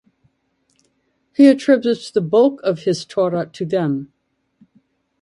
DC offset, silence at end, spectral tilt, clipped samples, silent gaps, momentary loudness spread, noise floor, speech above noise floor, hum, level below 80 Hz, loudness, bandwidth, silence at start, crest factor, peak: under 0.1%; 1.15 s; -6.5 dB/octave; under 0.1%; none; 10 LU; -66 dBFS; 50 dB; none; -66 dBFS; -17 LUFS; 11 kHz; 1.4 s; 18 dB; 0 dBFS